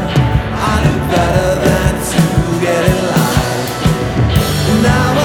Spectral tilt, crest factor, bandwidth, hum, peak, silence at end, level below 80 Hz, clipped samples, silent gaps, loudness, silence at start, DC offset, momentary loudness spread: -5.5 dB/octave; 12 dB; 19 kHz; none; 0 dBFS; 0 s; -24 dBFS; under 0.1%; none; -13 LUFS; 0 s; under 0.1%; 3 LU